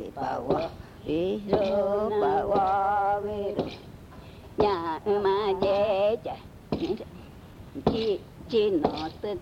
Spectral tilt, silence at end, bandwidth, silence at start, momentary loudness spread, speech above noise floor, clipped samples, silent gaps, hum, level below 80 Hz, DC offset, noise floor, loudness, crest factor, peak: -7 dB/octave; 0 s; 15 kHz; 0 s; 18 LU; 20 dB; under 0.1%; none; none; -52 dBFS; under 0.1%; -46 dBFS; -27 LUFS; 18 dB; -8 dBFS